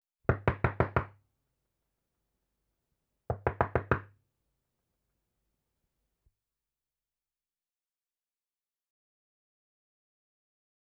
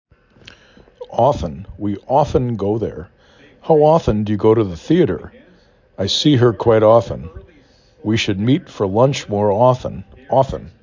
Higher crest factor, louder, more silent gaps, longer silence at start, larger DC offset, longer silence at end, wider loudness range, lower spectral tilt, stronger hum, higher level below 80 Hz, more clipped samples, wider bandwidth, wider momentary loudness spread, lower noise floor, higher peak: first, 30 dB vs 16 dB; second, -32 LUFS vs -16 LUFS; neither; second, 0.3 s vs 1 s; neither; first, 6.85 s vs 0.15 s; about the same, 3 LU vs 4 LU; first, -9.5 dB/octave vs -6.5 dB/octave; neither; second, -52 dBFS vs -40 dBFS; neither; second, 5.4 kHz vs 7.6 kHz; second, 5 LU vs 15 LU; first, under -90 dBFS vs -51 dBFS; second, -10 dBFS vs -2 dBFS